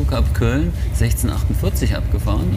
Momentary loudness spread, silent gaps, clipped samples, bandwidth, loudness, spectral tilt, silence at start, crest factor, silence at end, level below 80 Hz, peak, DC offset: 2 LU; none; under 0.1%; 16 kHz; -19 LUFS; -6 dB/octave; 0 s; 12 dB; 0 s; -20 dBFS; -4 dBFS; under 0.1%